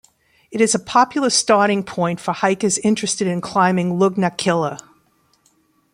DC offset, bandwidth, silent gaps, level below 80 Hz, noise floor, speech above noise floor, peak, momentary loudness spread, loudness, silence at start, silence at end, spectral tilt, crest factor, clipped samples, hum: under 0.1%; 15.5 kHz; none; -60 dBFS; -60 dBFS; 43 dB; -2 dBFS; 6 LU; -18 LUFS; 0.5 s; 1.15 s; -4 dB/octave; 18 dB; under 0.1%; none